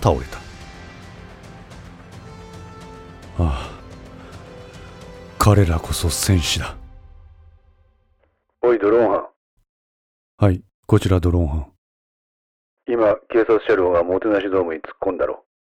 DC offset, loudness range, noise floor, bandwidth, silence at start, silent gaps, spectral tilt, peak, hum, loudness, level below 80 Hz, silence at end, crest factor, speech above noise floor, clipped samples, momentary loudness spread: under 0.1%; 11 LU; -64 dBFS; 18 kHz; 0 s; 9.36-9.57 s, 9.69-10.38 s, 10.74-10.83 s, 11.78-12.77 s; -6 dB/octave; -2 dBFS; none; -19 LUFS; -36 dBFS; 0.4 s; 20 dB; 47 dB; under 0.1%; 23 LU